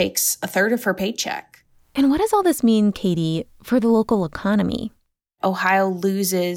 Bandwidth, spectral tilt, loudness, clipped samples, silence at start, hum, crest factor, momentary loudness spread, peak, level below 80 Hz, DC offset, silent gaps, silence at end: 17 kHz; -4.5 dB/octave; -20 LUFS; under 0.1%; 0 s; none; 14 dB; 9 LU; -6 dBFS; -50 dBFS; under 0.1%; none; 0 s